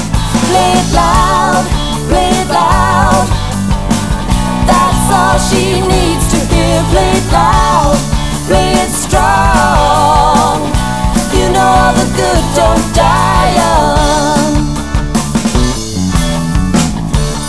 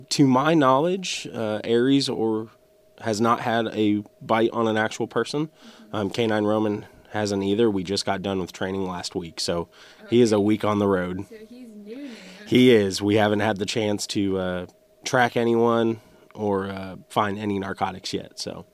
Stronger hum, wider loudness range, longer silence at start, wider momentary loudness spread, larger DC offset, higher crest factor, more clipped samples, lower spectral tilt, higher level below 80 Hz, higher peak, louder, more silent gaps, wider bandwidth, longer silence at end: neither; about the same, 2 LU vs 3 LU; about the same, 0 s vs 0 s; second, 6 LU vs 15 LU; first, 4% vs under 0.1%; second, 10 dB vs 18 dB; first, 0.3% vs under 0.1%; about the same, -4.5 dB/octave vs -5 dB/octave; first, -18 dBFS vs -62 dBFS; first, 0 dBFS vs -6 dBFS; first, -10 LUFS vs -23 LUFS; neither; second, 11 kHz vs 15 kHz; about the same, 0 s vs 0.1 s